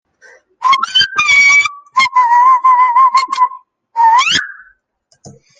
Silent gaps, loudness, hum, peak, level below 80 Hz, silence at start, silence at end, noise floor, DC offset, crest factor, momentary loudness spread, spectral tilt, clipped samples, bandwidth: none; -10 LUFS; none; 0 dBFS; -60 dBFS; 0.6 s; 1.05 s; -59 dBFS; under 0.1%; 12 dB; 9 LU; 1 dB/octave; under 0.1%; 9.4 kHz